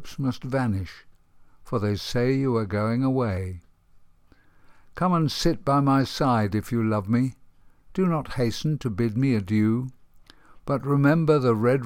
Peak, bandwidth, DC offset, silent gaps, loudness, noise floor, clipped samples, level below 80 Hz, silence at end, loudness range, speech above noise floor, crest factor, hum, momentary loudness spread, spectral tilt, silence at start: -8 dBFS; 16 kHz; under 0.1%; none; -24 LUFS; -56 dBFS; under 0.1%; -48 dBFS; 0 s; 3 LU; 33 dB; 18 dB; none; 10 LU; -7 dB/octave; 0 s